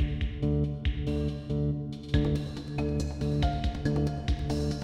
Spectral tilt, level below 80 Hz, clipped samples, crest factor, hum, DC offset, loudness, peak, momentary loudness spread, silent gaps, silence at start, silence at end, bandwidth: -7.5 dB/octave; -34 dBFS; under 0.1%; 16 dB; none; 0.1%; -31 LUFS; -12 dBFS; 4 LU; none; 0 s; 0 s; 11 kHz